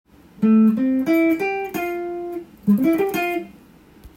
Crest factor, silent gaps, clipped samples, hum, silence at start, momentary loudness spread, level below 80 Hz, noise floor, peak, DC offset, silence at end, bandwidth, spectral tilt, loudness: 14 dB; none; under 0.1%; none; 0.4 s; 13 LU; -56 dBFS; -48 dBFS; -8 dBFS; under 0.1%; 0.1 s; 16.5 kHz; -7 dB/octave; -20 LUFS